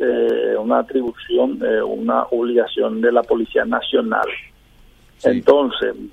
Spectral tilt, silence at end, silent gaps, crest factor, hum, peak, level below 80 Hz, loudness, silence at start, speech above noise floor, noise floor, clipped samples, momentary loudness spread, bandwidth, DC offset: -6 dB/octave; 0.05 s; none; 18 dB; none; 0 dBFS; -52 dBFS; -18 LUFS; 0 s; 31 dB; -49 dBFS; under 0.1%; 6 LU; 8.4 kHz; under 0.1%